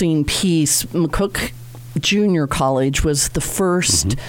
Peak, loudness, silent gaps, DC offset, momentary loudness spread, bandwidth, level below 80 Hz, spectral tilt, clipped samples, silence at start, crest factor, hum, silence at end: -2 dBFS; -17 LUFS; none; under 0.1%; 7 LU; 18 kHz; -32 dBFS; -4 dB/octave; under 0.1%; 0 s; 16 dB; none; 0 s